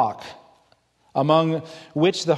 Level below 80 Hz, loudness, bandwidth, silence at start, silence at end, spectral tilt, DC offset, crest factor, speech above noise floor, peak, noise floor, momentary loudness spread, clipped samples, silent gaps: -68 dBFS; -22 LUFS; 12 kHz; 0 s; 0 s; -6 dB/octave; under 0.1%; 18 dB; 40 dB; -4 dBFS; -62 dBFS; 17 LU; under 0.1%; none